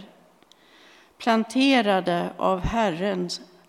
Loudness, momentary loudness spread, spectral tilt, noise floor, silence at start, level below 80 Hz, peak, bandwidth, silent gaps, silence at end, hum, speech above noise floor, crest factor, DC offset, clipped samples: -23 LUFS; 9 LU; -5 dB/octave; -56 dBFS; 0 s; -44 dBFS; -6 dBFS; 13 kHz; none; 0.25 s; none; 34 dB; 18 dB; under 0.1%; under 0.1%